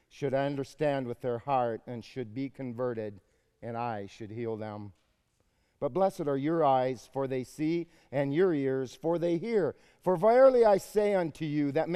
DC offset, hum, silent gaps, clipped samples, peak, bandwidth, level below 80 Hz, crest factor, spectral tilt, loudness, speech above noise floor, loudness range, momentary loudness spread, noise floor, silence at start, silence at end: under 0.1%; none; none; under 0.1%; -10 dBFS; 14.5 kHz; -64 dBFS; 18 dB; -7 dB/octave; -30 LUFS; 44 dB; 11 LU; 15 LU; -73 dBFS; 0.15 s; 0 s